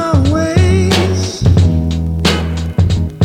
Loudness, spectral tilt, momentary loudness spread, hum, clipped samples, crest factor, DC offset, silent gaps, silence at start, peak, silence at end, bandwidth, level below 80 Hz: -13 LUFS; -6 dB/octave; 5 LU; none; under 0.1%; 12 dB; under 0.1%; none; 0 s; 0 dBFS; 0 s; 13 kHz; -22 dBFS